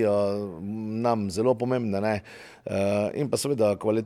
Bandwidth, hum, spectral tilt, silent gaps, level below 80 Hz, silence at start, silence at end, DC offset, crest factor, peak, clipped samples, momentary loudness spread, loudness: 15 kHz; none; -6 dB/octave; none; -62 dBFS; 0 s; 0 s; under 0.1%; 16 dB; -10 dBFS; under 0.1%; 9 LU; -26 LUFS